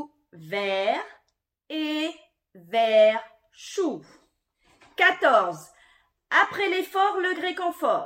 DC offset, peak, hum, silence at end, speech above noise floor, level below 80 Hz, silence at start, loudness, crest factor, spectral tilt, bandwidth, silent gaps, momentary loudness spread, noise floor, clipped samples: under 0.1%; -6 dBFS; none; 0 s; 51 dB; -76 dBFS; 0 s; -24 LUFS; 20 dB; -3.5 dB/octave; 16.5 kHz; none; 17 LU; -74 dBFS; under 0.1%